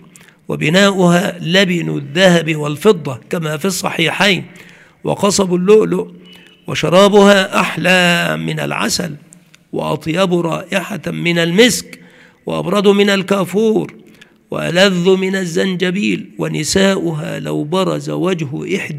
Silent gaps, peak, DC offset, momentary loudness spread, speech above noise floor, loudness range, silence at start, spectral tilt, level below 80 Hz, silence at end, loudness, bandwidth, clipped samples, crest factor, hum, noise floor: none; 0 dBFS; under 0.1%; 11 LU; 30 dB; 4 LU; 0.5 s; -4.5 dB/octave; -52 dBFS; 0 s; -14 LUFS; 16 kHz; under 0.1%; 14 dB; none; -44 dBFS